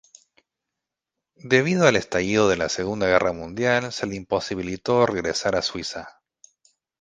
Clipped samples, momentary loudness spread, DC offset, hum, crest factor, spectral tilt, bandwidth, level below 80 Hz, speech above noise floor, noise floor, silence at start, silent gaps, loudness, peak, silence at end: under 0.1%; 10 LU; under 0.1%; none; 24 dB; -4.5 dB/octave; 9.8 kHz; -52 dBFS; 63 dB; -85 dBFS; 1.45 s; none; -22 LUFS; 0 dBFS; 0.95 s